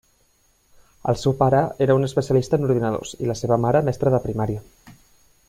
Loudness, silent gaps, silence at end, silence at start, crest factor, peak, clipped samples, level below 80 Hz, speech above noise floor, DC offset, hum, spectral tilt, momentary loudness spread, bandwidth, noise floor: -21 LUFS; none; 0.6 s; 1.05 s; 18 dB; -4 dBFS; under 0.1%; -48 dBFS; 42 dB; under 0.1%; none; -7 dB/octave; 8 LU; 14.5 kHz; -62 dBFS